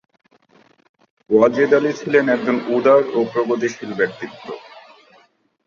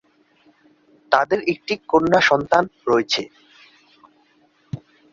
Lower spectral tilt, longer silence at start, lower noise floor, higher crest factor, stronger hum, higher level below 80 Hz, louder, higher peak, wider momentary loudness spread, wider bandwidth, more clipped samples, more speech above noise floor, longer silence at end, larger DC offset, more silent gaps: first, -6 dB/octave vs -4.5 dB/octave; first, 1.3 s vs 1.1 s; about the same, -57 dBFS vs -59 dBFS; about the same, 18 dB vs 22 dB; neither; second, -64 dBFS vs -58 dBFS; about the same, -17 LUFS vs -19 LUFS; about the same, -2 dBFS vs 0 dBFS; second, 17 LU vs 20 LU; about the same, 7.2 kHz vs 7.6 kHz; neither; about the same, 40 dB vs 40 dB; first, 0.85 s vs 0.35 s; neither; neither